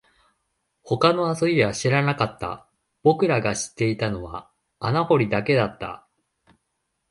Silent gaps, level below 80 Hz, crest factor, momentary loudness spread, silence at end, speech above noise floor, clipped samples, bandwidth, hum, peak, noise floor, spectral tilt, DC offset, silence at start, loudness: none; -54 dBFS; 20 dB; 15 LU; 1.15 s; 54 dB; under 0.1%; 11.5 kHz; none; -4 dBFS; -76 dBFS; -5.5 dB/octave; under 0.1%; 0.85 s; -22 LUFS